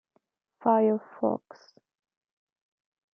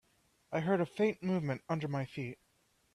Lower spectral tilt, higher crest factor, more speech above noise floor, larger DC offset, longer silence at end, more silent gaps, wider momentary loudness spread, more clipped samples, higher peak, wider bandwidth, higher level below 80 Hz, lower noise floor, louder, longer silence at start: first, -9.5 dB/octave vs -8 dB/octave; about the same, 22 dB vs 18 dB; first, 47 dB vs 39 dB; neither; first, 1.75 s vs 0.6 s; neither; second, 7 LU vs 11 LU; neither; first, -10 dBFS vs -18 dBFS; second, 6 kHz vs 12 kHz; second, -84 dBFS vs -72 dBFS; about the same, -73 dBFS vs -74 dBFS; first, -27 LUFS vs -35 LUFS; first, 0.65 s vs 0.5 s